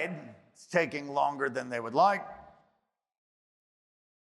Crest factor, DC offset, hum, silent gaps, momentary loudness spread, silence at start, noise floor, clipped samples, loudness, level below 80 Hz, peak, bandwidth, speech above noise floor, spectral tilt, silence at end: 20 dB; under 0.1%; none; none; 11 LU; 0 s; -78 dBFS; under 0.1%; -30 LUFS; -76 dBFS; -12 dBFS; 12 kHz; 48 dB; -5 dB/octave; 1.85 s